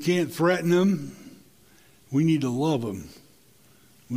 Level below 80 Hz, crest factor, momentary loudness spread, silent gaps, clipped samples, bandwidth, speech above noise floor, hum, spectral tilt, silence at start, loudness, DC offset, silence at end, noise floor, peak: -62 dBFS; 18 dB; 19 LU; none; under 0.1%; 16 kHz; 34 dB; none; -6.5 dB/octave; 0 s; -24 LUFS; under 0.1%; 0 s; -58 dBFS; -8 dBFS